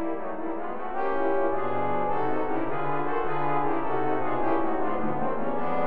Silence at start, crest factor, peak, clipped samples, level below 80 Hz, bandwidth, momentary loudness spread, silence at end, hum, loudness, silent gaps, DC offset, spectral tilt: 0 s; 14 dB; -12 dBFS; under 0.1%; -50 dBFS; 5.2 kHz; 6 LU; 0 s; none; -28 LUFS; none; 5%; -5.5 dB/octave